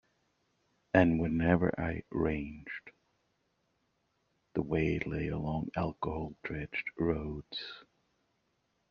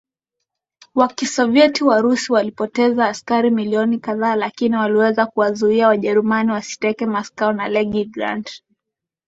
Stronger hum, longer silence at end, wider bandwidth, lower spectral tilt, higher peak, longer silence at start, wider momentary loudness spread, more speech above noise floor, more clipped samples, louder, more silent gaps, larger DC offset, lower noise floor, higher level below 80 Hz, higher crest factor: neither; first, 1.1 s vs 0.7 s; second, 6.6 kHz vs 8 kHz; first, -6 dB/octave vs -4.5 dB/octave; second, -10 dBFS vs -2 dBFS; about the same, 0.95 s vs 0.95 s; first, 13 LU vs 8 LU; second, 45 dB vs 66 dB; neither; second, -33 LUFS vs -18 LUFS; neither; neither; second, -78 dBFS vs -83 dBFS; first, -52 dBFS vs -60 dBFS; first, 24 dB vs 16 dB